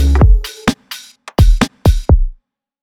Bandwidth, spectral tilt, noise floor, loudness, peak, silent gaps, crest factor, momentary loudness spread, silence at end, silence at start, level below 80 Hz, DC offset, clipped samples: 15 kHz; -6.5 dB/octave; -46 dBFS; -14 LUFS; 0 dBFS; none; 12 dB; 15 LU; 0.5 s; 0 s; -14 dBFS; under 0.1%; under 0.1%